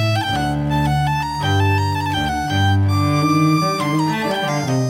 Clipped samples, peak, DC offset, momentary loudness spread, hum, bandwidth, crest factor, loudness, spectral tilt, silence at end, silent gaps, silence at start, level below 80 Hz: under 0.1%; -6 dBFS; under 0.1%; 4 LU; none; 16 kHz; 12 dB; -18 LUFS; -6 dB/octave; 0 s; none; 0 s; -38 dBFS